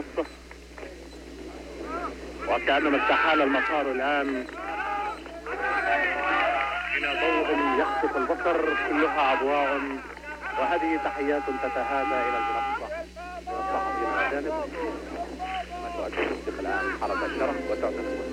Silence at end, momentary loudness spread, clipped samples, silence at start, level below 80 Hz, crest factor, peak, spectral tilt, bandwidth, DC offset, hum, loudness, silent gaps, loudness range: 0 s; 13 LU; under 0.1%; 0 s; -48 dBFS; 16 dB; -10 dBFS; -4.5 dB/octave; 15.5 kHz; under 0.1%; none; -27 LUFS; none; 5 LU